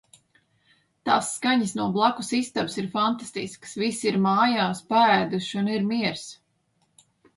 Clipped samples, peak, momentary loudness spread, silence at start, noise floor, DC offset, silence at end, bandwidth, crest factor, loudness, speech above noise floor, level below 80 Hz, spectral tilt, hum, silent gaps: under 0.1%; -6 dBFS; 12 LU; 1.05 s; -70 dBFS; under 0.1%; 1.05 s; 11.5 kHz; 18 dB; -24 LUFS; 46 dB; -68 dBFS; -4.5 dB/octave; none; none